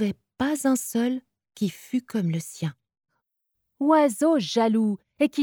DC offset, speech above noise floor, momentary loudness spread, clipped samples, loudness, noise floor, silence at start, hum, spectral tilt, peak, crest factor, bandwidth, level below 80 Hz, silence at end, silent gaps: under 0.1%; 56 dB; 11 LU; under 0.1%; -25 LUFS; -79 dBFS; 0 s; none; -5.5 dB/octave; -8 dBFS; 16 dB; 19.5 kHz; -66 dBFS; 0 s; none